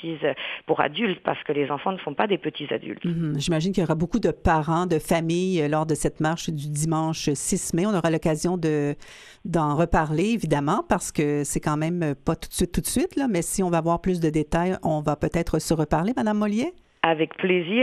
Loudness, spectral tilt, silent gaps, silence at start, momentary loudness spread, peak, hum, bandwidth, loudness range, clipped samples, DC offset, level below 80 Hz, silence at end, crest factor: -24 LUFS; -5.5 dB/octave; none; 0 s; 5 LU; -2 dBFS; none; 14.5 kHz; 2 LU; under 0.1%; under 0.1%; -42 dBFS; 0 s; 22 dB